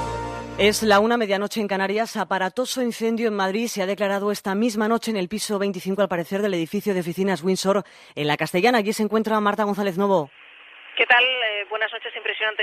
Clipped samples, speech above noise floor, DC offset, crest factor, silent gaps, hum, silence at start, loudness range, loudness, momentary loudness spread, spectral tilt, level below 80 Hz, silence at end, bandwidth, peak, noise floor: under 0.1%; 24 dB; under 0.1%; 18 dB; none; none; 0 s; 3 LU; -22 LUFS; 8 LU; -4 dB/octave; -52 dBFS; 0 s; 15 kHz; -4 dBFS; -46 dBFS